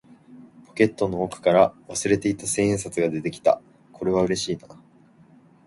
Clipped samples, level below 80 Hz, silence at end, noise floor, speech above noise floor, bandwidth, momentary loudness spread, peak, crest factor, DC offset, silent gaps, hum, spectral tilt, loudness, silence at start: under 0.1%; -54 dBFS; 0.95 s; -54 dBFS; 32 dB; 11.5 kHz; 9 LU; -2 dBFS; 22 dB; under 0.1%; none; none; -5 dB/octave; -23 LUFS; 0.3 s